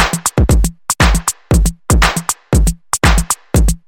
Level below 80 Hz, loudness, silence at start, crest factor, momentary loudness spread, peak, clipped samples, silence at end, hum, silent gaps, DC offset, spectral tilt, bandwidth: -16 dBFS; -14 LUFS; 0 s; 12 dB; 4 LU; 0 dBFS; under 0.1%; 0.1 s; none; none; under 0.1%; -4 dB/octave; 17 kHz